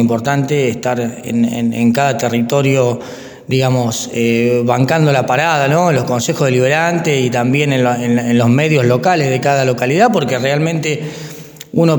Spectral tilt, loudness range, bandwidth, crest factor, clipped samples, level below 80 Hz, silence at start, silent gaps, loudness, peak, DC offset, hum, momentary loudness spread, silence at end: -5.5 dB/octave; 2 LU; 19.5 kHz; 14 dB; under 0.1%; -54 dBFS; 0 s; none; -14 LUFS; 0 dBFS; under 0.1%; none; 7 LU; 0 s